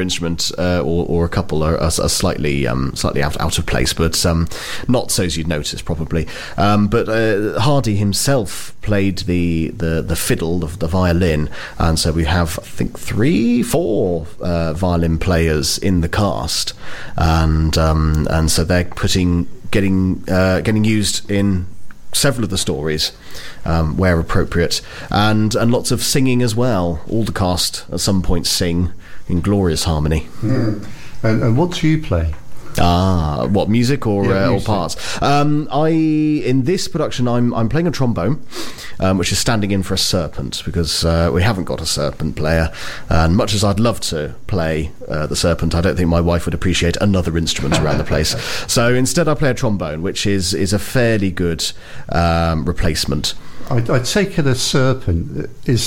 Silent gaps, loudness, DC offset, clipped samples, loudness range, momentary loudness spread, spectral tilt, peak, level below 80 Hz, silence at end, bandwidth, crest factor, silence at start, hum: none; -17 LUFS; under 0.1%; under 0.1%; 2 LU; 7 LU; -5 dB/octave; 0 dBFS; -28 dBFS; 0 s; 17 kHz; 16 dB; 0 s; none